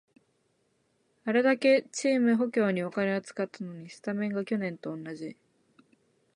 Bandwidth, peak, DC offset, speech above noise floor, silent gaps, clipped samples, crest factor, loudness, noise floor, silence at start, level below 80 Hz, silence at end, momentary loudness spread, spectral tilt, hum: 10.5 kHz; -12 dBFS; under 0.1%; 44 dB; none; under 0.1%; 18 dB; -28 LUFS; -73 dBFS; 1.25 s; -80 dBFS; 1.05 s; 16 LU; -5.5 dB/octave; none